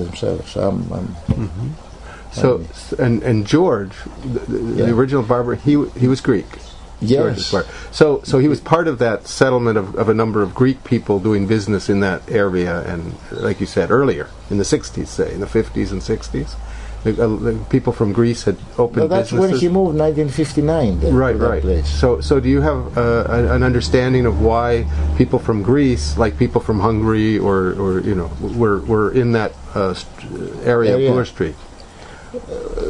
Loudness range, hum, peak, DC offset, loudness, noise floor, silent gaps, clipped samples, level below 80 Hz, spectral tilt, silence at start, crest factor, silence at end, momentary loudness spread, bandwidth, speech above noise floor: 4 LU; none; 0 dBFS; under 0.1%; -17 LUFS; -37 dBFS; none; under 0.1%; -30 dBFS; -7 dB/octave; 0 s; 16 dB; 0 s; 11 LU; 11 kHz; 20 dB